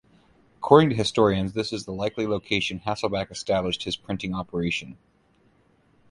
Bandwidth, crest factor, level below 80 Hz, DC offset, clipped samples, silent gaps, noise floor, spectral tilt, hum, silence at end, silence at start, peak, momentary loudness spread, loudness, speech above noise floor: 11.5 kHz; 24 dB; -50 dBFS; under 0.1%; under 0.1%; none; -62 dBFS; -5.5 dB/octave; none; 1.15 s; 0.6 s; 0 dBFS; 12 LU; -24 LUFS; 38 dB